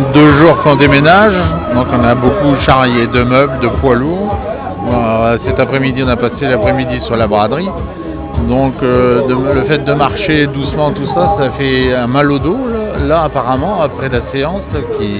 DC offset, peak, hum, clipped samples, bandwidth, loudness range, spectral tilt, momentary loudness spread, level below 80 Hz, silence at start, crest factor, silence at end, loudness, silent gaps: under 0.1%; 0 dBFS; none; 0.4%; 4 kHz; 4 LU; -10.5 dB/octave; 10 LU; -26 dBFS; 0 s; 10 dB; 0 s; -11 LUFS; none